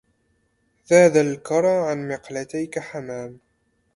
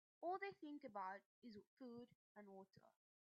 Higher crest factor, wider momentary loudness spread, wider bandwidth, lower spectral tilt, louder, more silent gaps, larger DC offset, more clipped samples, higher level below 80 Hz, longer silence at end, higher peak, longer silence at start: about the same, 22 dB vs 18 dB; about the same, 17 LU vs 15 LU; first, 11.5 kHz vs 6.6 kHz; first, -5.5 dB/octave vs -3.5 dB/octave; first, -21 LUFS vs -55 LUFS; second, none vs 1.26-1.42 s, 1.67-1.77 s, 2.15-2.35 s; neither; neither; first, -64 dBFS vs under -90 dBFS; first, 0.6 s vs 0.45 s; first, -2 dBFS vs -38 dBFS; first, 0.9 s vs 0.2 s